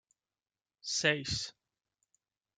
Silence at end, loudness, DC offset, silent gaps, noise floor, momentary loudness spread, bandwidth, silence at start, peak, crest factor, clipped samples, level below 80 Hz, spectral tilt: 1.05 s; -32 LUFS; under 0.1%; none; under -90 dBFS; 14 LU; 11 kHz; 0.85 s; -12 dBFS; 26 dB; under 0.1%; -64 dBFS; -2.5 dB/octave